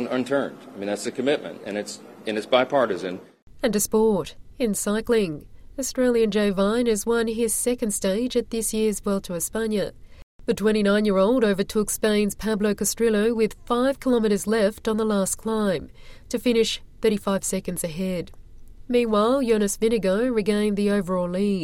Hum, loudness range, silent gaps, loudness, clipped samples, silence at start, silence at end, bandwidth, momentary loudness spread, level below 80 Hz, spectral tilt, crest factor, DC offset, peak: none; 3 LU; 3.42-3.47 s, 10.23-10.39 s; -23 LUFS; under 0.1%; 0 s; 0 s; 16.5 kHz; 10 LU; -46 dBFS; -4.5 dB/octave; 18 dB; under 0.1%; -4 dBFS